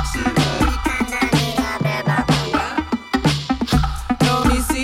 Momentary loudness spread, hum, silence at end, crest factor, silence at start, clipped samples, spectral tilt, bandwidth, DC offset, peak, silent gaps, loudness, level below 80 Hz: 4 LU; none; 0 s; 14 dB; 0 s; under 0.1%; -5 dB/octave; 16.5 kHz; under 0.1%; -6 dBFS; none; -19 LUFS; -28 dBFS